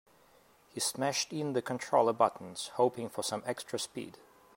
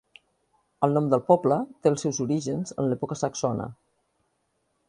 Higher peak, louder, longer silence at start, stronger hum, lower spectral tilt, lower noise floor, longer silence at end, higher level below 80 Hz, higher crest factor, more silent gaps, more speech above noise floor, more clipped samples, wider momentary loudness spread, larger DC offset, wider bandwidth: second, -12 dBFS vs -4 dBFS; second, -33 LUFS vs -25 LUFS; about the same, 0.75 s vs 0.8 s; neither; second, -3.5 dB/octave vs -6.5 dB/octave; second, -64 dBFS vs -74 dBFS; second, 0.45 s vs 1.15 s; second, -80 dBFS vs -64 dBFS; about the same, 22 dB vs 22 dB; neither; second, 31 dB vs 49 dB; neither; first, 12 LU vs 8 LU; neither; first, 16 kHz vs 11.5 kHz